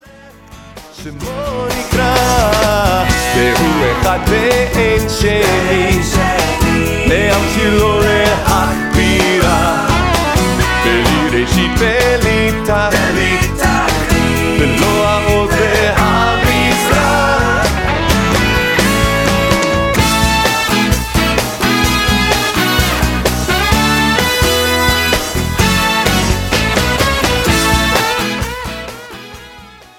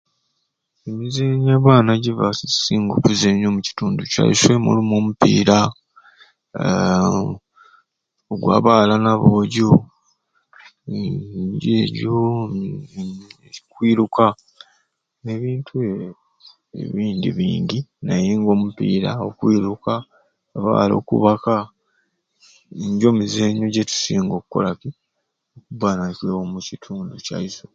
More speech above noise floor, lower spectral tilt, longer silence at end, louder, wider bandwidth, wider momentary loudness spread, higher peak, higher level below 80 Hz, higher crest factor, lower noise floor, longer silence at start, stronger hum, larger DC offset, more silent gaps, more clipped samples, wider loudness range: second, 24 dB vs 57 dB; second, -4 dB/octave vs -6 dB/octave; first, 0.3 s vs 0.15 s; first, -12 LUFS vs -18 LUFS; first, 18 kHz vs 9 kHz; second, 3 LU vs 17 LU; about the same, 0 dBFS vs 0 dBFS; first, -22 dBFS vs -50 dBFS; second, 12 dB vs 20 dB; second, -38 dBFS vs -75 dBFS; second, 0.25 s vs 0.85 s; neither; neither; neither; neither; second, 1 LU vs 7 LU